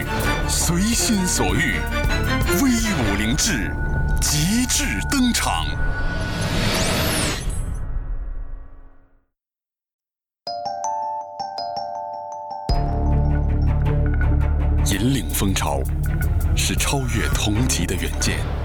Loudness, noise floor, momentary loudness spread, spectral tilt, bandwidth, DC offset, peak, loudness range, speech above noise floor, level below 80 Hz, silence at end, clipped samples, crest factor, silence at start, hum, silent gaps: -21 LUFS; under -90 dBFS; 11 LU; -4 dB/octave; over 20 kHz; under 0.1%; -10 dBFS; 11 LU; over 70 dB; -26 dBFS; 0 s; under 0.1%; 12 dB; 0 s; none; 9.93-9.99 s